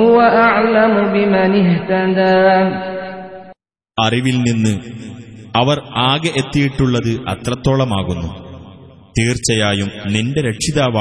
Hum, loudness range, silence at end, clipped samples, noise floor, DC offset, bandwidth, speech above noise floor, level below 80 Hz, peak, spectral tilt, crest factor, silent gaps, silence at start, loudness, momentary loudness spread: none; 5 LU; 0 s; under 0.1%; -44 dBFS; under 0.1%; 11 kHz; 30 dB; -40 dBFS; 0 dBFS; -5.5 dB/octave; 14 dB; none; 0 s; -15 LUFS; 15 LU